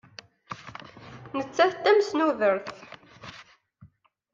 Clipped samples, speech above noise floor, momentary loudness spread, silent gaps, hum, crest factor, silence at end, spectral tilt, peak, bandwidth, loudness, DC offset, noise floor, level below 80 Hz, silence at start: under 0.1%; 35 dB; 24 LU; none; none; 22 dB; 0.45 s; -4.5 dB/octave; -6 dBFS; 7.6 kHz; -24 LUFS; under 0.1%; -58 dBFS; -70 dBFS; 0.5 s